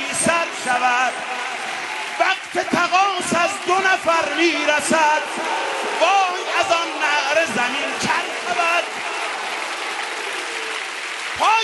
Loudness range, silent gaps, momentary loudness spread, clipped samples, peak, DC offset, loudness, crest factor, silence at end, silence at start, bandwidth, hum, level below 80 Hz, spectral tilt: 4 LU; none; 8 LU; under 0.1%; -2 dBFS; under 0.1%; -19 LUFS; 18 dB; 0 s; 0 s; 11.5 kHz; none; -64 dBFS; -1.5 dB/octave